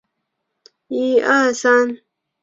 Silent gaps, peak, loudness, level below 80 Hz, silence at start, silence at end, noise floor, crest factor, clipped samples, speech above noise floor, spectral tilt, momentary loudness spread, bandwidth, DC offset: none; -2 dBFS; -16 LUFS; -68 dBFS; 0.9 s; 0.45 s; -76 dBFS; 18 dB; under 0.1%; 60 dB; -2.5 dB/octave; 12 LU; 7.8 kHz; under 0.1%